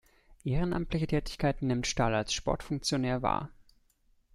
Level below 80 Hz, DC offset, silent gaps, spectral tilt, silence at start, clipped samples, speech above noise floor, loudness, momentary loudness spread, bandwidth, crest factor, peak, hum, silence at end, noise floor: -44 dBFS; under 0.1%; none; -5 dB/octave; 0.3 s; under 0.1%; 38 dB; -31 LUFS; 5 LU; 13.5 kHz; 18 dB; -14 dBFS; none; 0.85 s; -68 dBFS